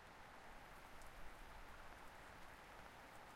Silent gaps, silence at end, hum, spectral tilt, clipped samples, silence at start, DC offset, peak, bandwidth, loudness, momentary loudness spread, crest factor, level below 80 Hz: none; 0 s; none; -3.5 dB/octave; under 0.1%; 0 s; under 0.1%; -42 dBFS; 16 kHz; -60 LUFS; 1 LU; 14 dB; -64 dBFS